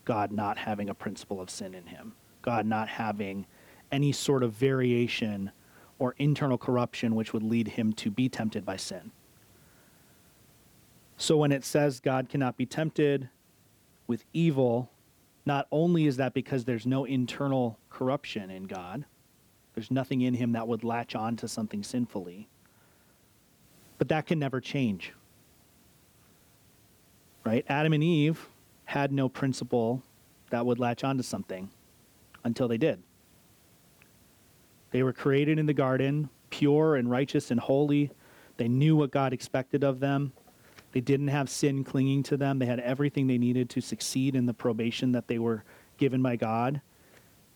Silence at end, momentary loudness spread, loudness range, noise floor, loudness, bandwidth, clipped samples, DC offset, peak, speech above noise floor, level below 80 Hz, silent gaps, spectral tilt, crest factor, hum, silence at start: 0.75 s; 12 LU; 7 LU; -63 dBFS; -29 LUFS; 19.5 kHz; under 0.1%; under 0.1%; -14 dBFS; 35 dB; -68 dBFS; none; -6.5 dB/octave; 16 dB; none; 0.05 s